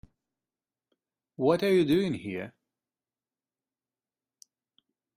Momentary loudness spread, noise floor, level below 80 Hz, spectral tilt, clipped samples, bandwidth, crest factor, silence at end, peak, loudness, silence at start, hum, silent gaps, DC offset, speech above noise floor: 15 LU; under -90 dBFS; -66 dBFS; -7 dB/octave; under 0.1%; 15.5 kHz; 22 dB; 2.7 s; -10 dBFS; -27 LUFS; 1.4 s; none; none; under 0.1%; over 64 dB